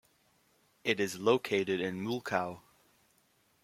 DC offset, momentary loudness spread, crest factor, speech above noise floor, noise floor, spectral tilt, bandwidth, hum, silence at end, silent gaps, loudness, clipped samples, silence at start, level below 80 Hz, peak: under 0.1%; 9 LU; 24 dB; 39 dB; -71 dBFS; -4.5 dB/octave; 16 kHz; none; 1.05 s; none; -33 LUFS; under 0.1%; 0.85 s; -76 dBFS; -10 dBFS